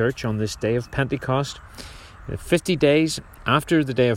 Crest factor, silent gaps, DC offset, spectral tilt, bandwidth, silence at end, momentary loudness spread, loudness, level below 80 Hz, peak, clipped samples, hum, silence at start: 18 dB; none; under 0.1%; -5.5 dB/octave; 16 kHz; 0 s; 20 LU; -22 LUFS; -44 dBFS; -4 dBFS; under 0.1%; none; 0 s